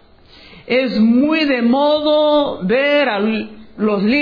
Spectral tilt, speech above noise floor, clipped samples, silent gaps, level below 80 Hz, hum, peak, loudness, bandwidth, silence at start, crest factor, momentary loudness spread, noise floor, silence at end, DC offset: -7.5 dB/octave; 29 dB; under 0.1%; none; -50 dBFS; none; -6 dBFS; -15 LUFS; 5.2 kHz; 0.55 s; 10 dB; 6 LU; -44 dBFS; 0 s; under 0.1%